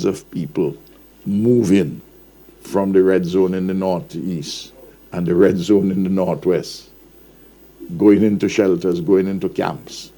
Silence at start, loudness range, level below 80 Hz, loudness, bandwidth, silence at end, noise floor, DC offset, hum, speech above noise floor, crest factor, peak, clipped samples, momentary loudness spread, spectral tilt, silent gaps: 0 s; 2 LU; -54 dBFS; -18 LUFS; 20 kHz; 0.1 s; -46 dBFS; under 0.1%; none; 29 dB; 16 dB; -2 dBFS; under 0.1%; 16 LU; -7 dB/octave; none